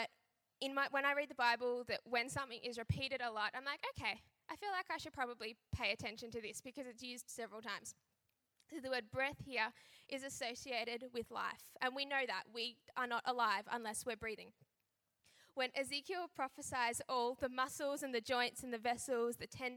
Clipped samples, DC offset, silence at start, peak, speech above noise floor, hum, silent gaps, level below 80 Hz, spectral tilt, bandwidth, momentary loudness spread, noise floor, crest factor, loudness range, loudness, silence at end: under 0.1%; under 0.1%; 0 s; -20 dBFS; 45 dB; none; none; -70 dBFS; -3 dB/octave; 17.5 kHz; 11 LU; -87 dBFS; 22 dB; 5 LU; -42 LUFS; 0 s